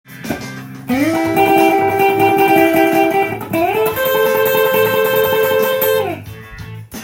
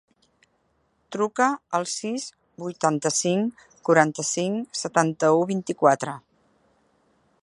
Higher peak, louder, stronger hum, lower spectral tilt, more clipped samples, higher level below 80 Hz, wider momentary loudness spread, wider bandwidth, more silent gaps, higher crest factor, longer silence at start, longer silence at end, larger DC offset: about the same, 0 dBFS vs -2 dBFS; first, -14 LUFS vs -24 LUFS; neither; about the same, -5 dB/octave vs -4 dB/octave; neither; first, -48 dBFS vs -72 dBFS; first, 17 LU vs 13 LU; first, 17 kHz vs 11.5 kHz; neither; second, 14 dB vs 24 dB; second, 0.1 s vs 1.1 s; second, 0 s vs 1.25 s; neither